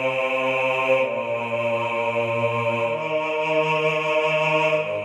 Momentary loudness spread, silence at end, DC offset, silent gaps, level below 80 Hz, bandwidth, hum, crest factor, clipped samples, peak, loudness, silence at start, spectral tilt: 4 LU; 0 s; under 0.1%; none; -70 dBFS; 12.5 kHz; none; 14 dB; under 0.1%; -8 dBFS; -22 LUFS; 0 s; -5.5 dB/octave